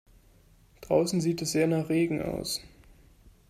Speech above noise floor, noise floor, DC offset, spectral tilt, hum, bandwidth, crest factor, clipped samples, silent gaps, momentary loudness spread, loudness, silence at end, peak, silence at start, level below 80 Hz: 32 dB; -59 dBFS; under 0.1%; -5 dB/octave; none; 15.5 kHz; 20 dB; under 0.1%; none; 7 LU; -28 LUFS; 0.85 s; -10 dBFS; 0.8 s; -56 dBFS